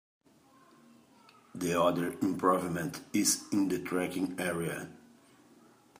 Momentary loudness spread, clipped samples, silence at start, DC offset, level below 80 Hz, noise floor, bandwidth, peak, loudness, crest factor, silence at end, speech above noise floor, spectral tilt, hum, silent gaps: 9 LU; under 0.1%; 1.55 s; under 0.1%; -72 dBFS; -62 dBFS; 15.5 kHz; -12 dBFS; -31 LUFS; 20 dB; 1.05 s; 31 dB; -4 dB/octave; none; none